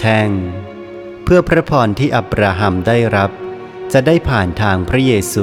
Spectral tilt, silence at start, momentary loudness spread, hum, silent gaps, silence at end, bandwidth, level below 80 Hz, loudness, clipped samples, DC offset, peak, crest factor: -6 dB/octave; 0 s; 16 LU; none; none; 0 s; 16.5 kHz; -32 dBFS; -14 LUFS; under 0.1%; under 0.1%; 0 dBFS; 14 dB